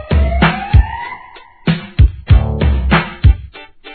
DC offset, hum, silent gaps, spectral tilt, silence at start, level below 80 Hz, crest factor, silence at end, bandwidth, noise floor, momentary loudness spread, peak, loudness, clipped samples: 0.3%; none; none; -10.5 dB/octave; 0 s; -16 dBFS; 12 dB; 0 s; 4.5 kHz; -38 dBFS; 15 LU; 0 dBFS; -14 LUFS; 0.4%